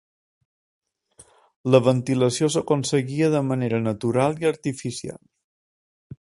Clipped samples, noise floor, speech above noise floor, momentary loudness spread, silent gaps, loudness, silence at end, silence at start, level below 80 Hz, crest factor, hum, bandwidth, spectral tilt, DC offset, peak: under 0.1%; -55 dBFS; 33 dB; 12 LU; 5.44-6.10 s; -22 LUFS; 0.1 s; 1.65 s; -60 dBFS; 24 dB; none; 11.5 kHz; -6 dB/octave; under 0.1%; 0 dBFS